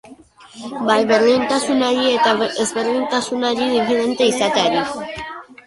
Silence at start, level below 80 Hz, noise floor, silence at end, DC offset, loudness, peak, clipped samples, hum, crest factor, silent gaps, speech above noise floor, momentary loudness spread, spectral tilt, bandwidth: 0.1 s; -56 dBFS; -43 dBFS; 0.25 s; under 0.1%; -17 LUFS; -2 dBFS; under 0.1%; none; 16 dB; none; 26 dB; 13 LU; -3 dB/octave; 11.5 kHz